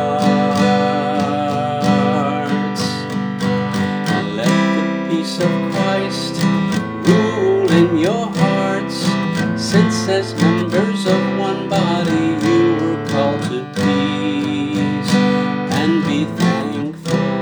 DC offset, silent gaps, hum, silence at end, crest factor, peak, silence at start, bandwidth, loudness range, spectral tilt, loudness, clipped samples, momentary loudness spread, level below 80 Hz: under 0.1%; none; none; 0 s; 16 dB; 0 dBFS; 0 s; over 20 kHz; 2 LU; -6 dB/octave; -17 LUFS; under 0.1%; 5 LU; -54 dBFS